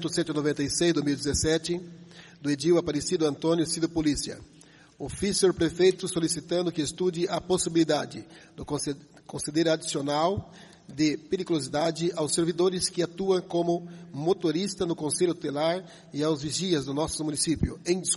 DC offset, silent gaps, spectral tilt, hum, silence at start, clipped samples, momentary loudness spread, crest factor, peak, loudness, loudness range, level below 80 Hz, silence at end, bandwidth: under 0.1%; none; -4.5 dB/octave; none; 0 s; under 0.1%; 11 LU; 18 dB; -10 dBFS; -27 LUFS; 2 LU; -50 dBFS; 0 s; 11.5 kHz